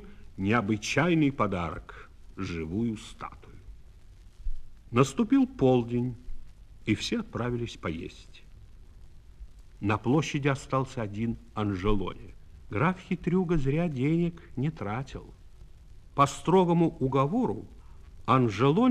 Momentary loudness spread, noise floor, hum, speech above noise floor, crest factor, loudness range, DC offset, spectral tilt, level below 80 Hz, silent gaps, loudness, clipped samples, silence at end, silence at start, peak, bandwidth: 18 LU; -50 dBFS; none; 23 dB; 22 dB; 7 LU; under 0.1%; -6.5 dB/octave; -44 dBFS; none; -28 LUFS; under 0.1%; 0 s; 0 s; -8 dBFS; 12 kHz